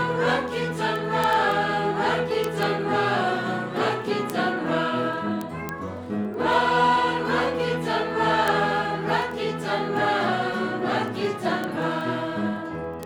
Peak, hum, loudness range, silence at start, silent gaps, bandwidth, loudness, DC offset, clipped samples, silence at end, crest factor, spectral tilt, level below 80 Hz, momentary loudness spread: -6 dBFS; none; 3 LU; 0 s; none; over 20 kHz; -24 LUFS; under 0.1%; under 0.1%; 0 s; 18 dB; -5.5 dB/octave; -56 dBFS; 7 LU